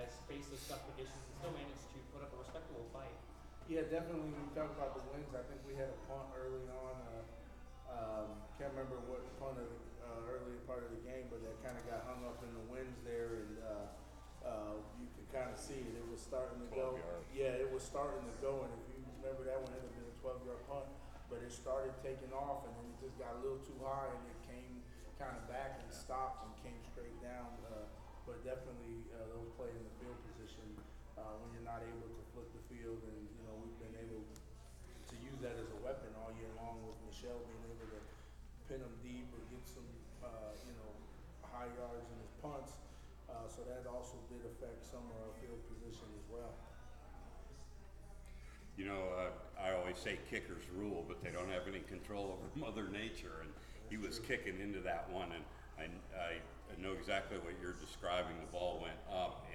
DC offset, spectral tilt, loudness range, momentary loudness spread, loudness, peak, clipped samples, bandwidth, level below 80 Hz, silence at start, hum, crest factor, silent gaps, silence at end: under 0.1%; -5.5 dB/octave; 8 LU; 13 LU; -48 LUFS; -24 dBFS; under 0.1%; over 20 kHz; -56 dBFS; 0 s; none; 24 dB; none; 0 s